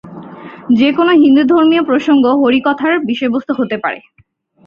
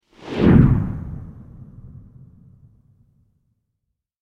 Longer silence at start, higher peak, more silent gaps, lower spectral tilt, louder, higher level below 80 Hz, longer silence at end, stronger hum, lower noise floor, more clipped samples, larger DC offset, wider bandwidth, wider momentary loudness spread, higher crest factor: second, 0.05 s vs 0.25 s; about the same, -2 dBFS vs -2 dBFS; neither; second, -6.5 dB/octave vs -10 dB/octave; first, -12 LUFS vs -17 LUFS; second, -56 dBFS vs -34 dBFS; second, 0.65 s vs 2.35 s; neither; second, -31 dBFS vs -78 dBFS; neither; neither; first, 7 kHz vs 6 kHz; second, 20 LU vs 28 LU; second, 12 dB vs 20 dB